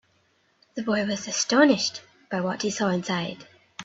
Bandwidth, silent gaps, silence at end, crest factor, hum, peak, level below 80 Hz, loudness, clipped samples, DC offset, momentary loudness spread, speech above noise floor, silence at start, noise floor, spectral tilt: 8 kHz; none; 0 s; 20 dB; none; -6 dBFS; -68 dBFS; -25 LUFS; under 0.1%; under 0.1%; 20 LU; 42 dB; 0.75 s; -66 dBFS; -3.5 dB/octave